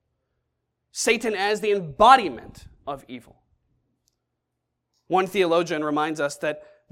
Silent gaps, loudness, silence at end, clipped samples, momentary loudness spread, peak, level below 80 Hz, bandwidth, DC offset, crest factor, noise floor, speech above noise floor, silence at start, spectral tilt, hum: none; -22 LUFS; 0.3 s; under 0.1%; 22 LU; 0 dBFS; -56 dBFS; 16.5 kHz; under 0.1%; 24 dB; -80 dBFS; 58 dB; 0.95 s; -3.5 dB/octave; none